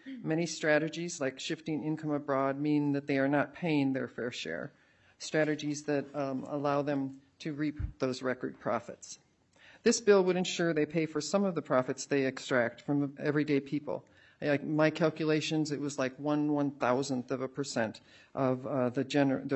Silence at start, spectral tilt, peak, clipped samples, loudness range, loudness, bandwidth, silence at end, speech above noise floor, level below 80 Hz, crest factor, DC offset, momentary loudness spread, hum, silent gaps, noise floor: 0.05 s; -5.5 dB/octave; -12 dBFS; under 0.1%; 5 LU; -32 LUFS; 8.4 kHz; 0 s; 30 dB; -60 dBFS; 20 dB; under 0.1%; 8 LU; none; none; -61 dBFS